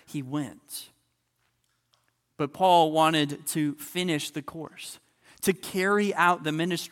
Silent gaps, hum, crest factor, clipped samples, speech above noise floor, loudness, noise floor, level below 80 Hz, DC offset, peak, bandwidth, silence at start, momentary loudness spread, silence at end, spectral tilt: none; none; 20 dB; under 0.1%; 48 dB; -26 LUFS; -74 dBFS; -70 dBFS; under 0.1%; -6 dBFS; 17.5 kHz; 0.1 s; 18 LU; 0.05 s; -4.5 dB/octave